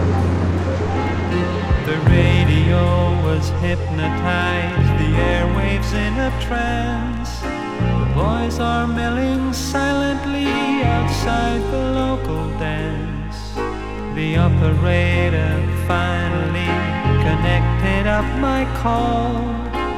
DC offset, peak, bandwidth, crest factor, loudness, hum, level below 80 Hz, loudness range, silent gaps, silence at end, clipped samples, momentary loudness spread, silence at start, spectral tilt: under 0.1%; -2 dBFS; 13.5 kHz; 16 dB; -19 LUFS; none; -26 dBFS; 3 LU; none; 0 s; under 0.1%; 8 LU; 0 s; -6.5 dB/octave